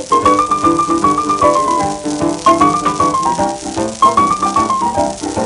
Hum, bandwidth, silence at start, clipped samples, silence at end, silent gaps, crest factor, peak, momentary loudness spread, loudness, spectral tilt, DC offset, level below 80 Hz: none; 11.5 kHz; 0 s; under 0.1%; 0 s; none; 14 dB; 0 dBFS; 7 LU; -13 LUFS; -4.5 dB/octave; under 0.1%; -40 dBFS